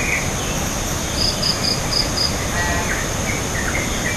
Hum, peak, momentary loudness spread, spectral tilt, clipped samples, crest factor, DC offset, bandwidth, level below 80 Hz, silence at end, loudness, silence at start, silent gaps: none; -4 dBFS; 4 LU; -2.5 dB/octave; under 0.1%; 16 dB; under 0.1%; 14 kHz; -30 dBFS; 0 s; -19 LUFS; 0 s; none